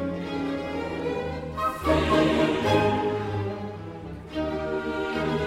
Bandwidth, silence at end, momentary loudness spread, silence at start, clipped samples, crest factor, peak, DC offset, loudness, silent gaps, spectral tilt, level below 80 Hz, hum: 16 kHz; 0 s; 13 LU; 0 s; under 0.1%; 18 dB; -8 dBFS; under 0.1%; -26 LUFS; none; -6.5 dB/octave; -44 dBFS; none